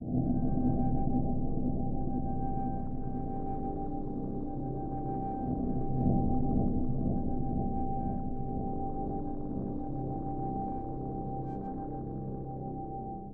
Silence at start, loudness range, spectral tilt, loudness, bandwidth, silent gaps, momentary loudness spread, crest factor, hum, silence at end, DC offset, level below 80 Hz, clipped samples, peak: 0 s; 5 LU; -13.5 dB/octave; -35 LUFS; 1.7 kHz; none; 8 LU; 16 dB; none; 0 s; under 0.1%; -38 dBFS; under 0.1%; -16 dBFS